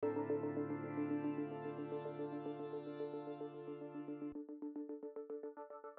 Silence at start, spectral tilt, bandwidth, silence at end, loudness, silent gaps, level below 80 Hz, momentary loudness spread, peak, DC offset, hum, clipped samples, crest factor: 0 s; -7.5 dB/octave; 4.3 kHz; 0 s; -45 LUFS; none; -86 dBFS; 9 LU; -28 dBFS; under 0.1%; none; under 0.1%; 16 dB